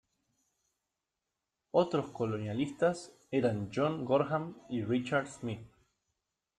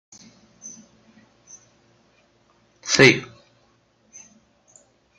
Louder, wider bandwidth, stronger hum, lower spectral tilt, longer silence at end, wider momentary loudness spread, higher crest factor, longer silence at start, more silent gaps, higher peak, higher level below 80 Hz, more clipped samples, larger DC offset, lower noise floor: second, -33 LUFS vs -16 LUFS; about the same, 11 kHz vs 11.5 kHz; neither; first, -6.5 dB/octave vs -3.5 dB/octave; second, 0.9 s vs 1.95 s; second, 10 LU vs 28 LU; second, 20 dB vs 26 dB; first, 1.75 s vs 0.65 s; neither; second, -14 dBFS vs 0 dBFS; second, -70 dBFS vs -62 dBFS; neither; neither; first, -88 dBFS vs -62 dBFS